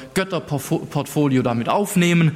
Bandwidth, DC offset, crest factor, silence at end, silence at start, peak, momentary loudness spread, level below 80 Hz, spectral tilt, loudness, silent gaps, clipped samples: 16 kHz; under 0.1%; 12 dB; 0 s; 0 s; -6 dBFS; 7 LU; -54 dBFS; -6 dB/octave; -20 LUFS; none; under 0.1%